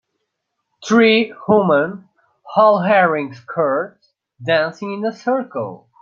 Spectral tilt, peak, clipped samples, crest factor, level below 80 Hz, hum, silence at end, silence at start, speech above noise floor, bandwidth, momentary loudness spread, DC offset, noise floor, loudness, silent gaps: -6 dB/octave; -2 dBFS; under 0.1%; 16 dB; -66 dBFS; none; 0.25 s; 0.8 s; 59 dB; 7.6 kHz; 15 LU; under 0.1%; -75 dBFS; -17 LUFS; none